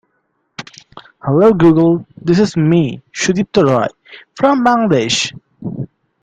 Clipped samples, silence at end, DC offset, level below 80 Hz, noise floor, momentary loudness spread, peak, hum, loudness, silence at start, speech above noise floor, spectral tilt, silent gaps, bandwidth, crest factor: under 0.1%; 0.35 s; under 0.1%; -50 dBFS; -65 dBFS; 20 LU; 0 dBFS; none; -13 LUFS; 0.6 s; 53 dB; -5.5 dB/octave; none; 9.4 kHz; 14 dB